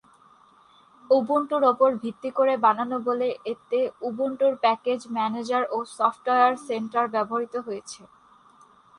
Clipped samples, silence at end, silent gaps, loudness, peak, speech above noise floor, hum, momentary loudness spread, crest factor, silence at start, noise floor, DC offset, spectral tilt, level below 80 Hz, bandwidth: under 0.1%; 1.05 s; none; -24 LUFS; -8 dBFS; 32 dB; none; 10 LU; 18 dB; 1.1 s; -56 dBFS; under 0.1%; -4.5 dB/octave; -74 dBFS; 11 kHz